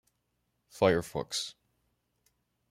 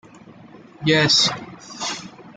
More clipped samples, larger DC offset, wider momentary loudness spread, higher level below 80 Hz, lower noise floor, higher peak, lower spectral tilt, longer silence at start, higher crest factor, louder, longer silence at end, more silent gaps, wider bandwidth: neither; neither; second, 9 LU vs 19 LU; about the same, -64 dBFS vs -60 dBFS; first, -79 dBFS vs -45 dBFS; second, -10 dBFS vs -4 dBFS; about the same, -4 dB/octave vs -3 dB/octave; first, 0.75 s vs 0.55 s; first, 24 dB vs 18 dB; second, -30 LUFS vs -18 LUFS; first, 1.2 s vs 0.05 s; neither; first, 16 kHz vs 11 kHz